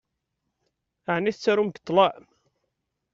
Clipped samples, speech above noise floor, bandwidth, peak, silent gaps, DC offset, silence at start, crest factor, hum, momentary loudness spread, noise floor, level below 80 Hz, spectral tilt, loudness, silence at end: under 0.1%; 57 dB; 7.6 kHz; -6 dBFS; none; under 0.1%; 1.1 s; 22 dB; none; 7 LU; -80 dBFS; -70 dBFS; -3.5 dB/octave; -24 LUFS; 1 s